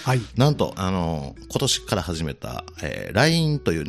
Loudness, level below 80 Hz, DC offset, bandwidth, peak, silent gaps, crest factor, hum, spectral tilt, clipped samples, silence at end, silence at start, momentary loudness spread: -23 LUFS; -44 dBFS; under 0.1%; 14.5 kHz; -4 dBFS; none; 20 dB; none; -5 dB/octave; under 0.1%; 0 s; 0 s; 12 LU